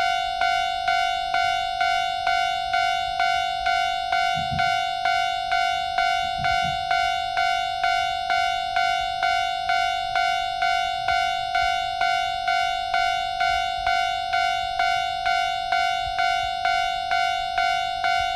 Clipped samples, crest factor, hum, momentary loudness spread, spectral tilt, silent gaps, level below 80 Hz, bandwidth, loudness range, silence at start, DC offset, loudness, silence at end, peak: under 0.1%; 14 dB; none; 1 LU; -1.5 dB/octave; none; -48 dBFS; 14 kHz; 0 LU; 0 s; under 0.1%; -23 LUFS; 0 s; -10 dBFS